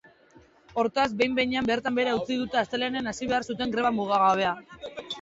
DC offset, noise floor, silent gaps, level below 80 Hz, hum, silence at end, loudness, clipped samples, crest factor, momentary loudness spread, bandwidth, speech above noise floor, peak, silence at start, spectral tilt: under 0.1%; -57 dBFS; none; -58 dBFS; none; 0 s; -26 LUFS; under 0.1%; 18 dB; 10 LU; 8 kHz; 31 dB; -10 dBFS; 0.75 s; -4.5 dB/octave